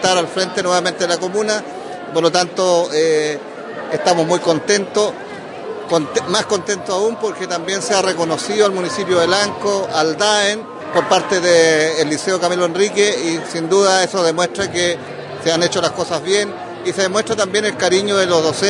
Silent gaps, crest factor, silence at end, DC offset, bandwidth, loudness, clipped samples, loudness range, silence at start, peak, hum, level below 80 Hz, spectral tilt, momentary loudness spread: none; 16 dB; 0 s; under 0.1%; 11 kHz; -16 LUFS; under 0.1%; 3 LU; 0 s; 0 dBFS; none; -62 dBFS; -3 dB/octave; 8 LU